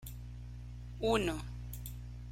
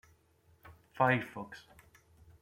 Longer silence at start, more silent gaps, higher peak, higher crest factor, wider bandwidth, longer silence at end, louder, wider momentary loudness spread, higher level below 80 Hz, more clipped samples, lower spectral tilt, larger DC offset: second, 0 s vs 0.65 s; neither; second, -18 dBFS vs -14 dBFS; about the same, 20 dB vs 24 dB; about the same, 16.5 kHz vs 16.5 kHz; second, 0 s vs 0.8 s; second, -39 LUFS vs -32 LUFS; second, 16 LU vs 23 LU; first, -46 dBFS vs -68 dBFS; neither; second, -5.5 dB/octave vs -7 dB/octave; neither